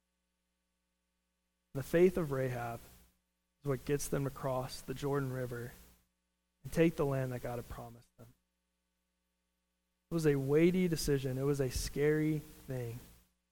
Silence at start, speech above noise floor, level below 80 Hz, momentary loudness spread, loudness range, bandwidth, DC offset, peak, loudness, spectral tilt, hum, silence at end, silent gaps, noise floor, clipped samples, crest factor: 1.75 s; 50 dB; -54 dBFS; 16 LU; 6 LU; 17.5 kHz; under 0.1%; -18 dBFS; -35 LUFS; -6.5 dB/octave; none; 0.45 s; none; -84 dBFS; under 0.1%; 20 dB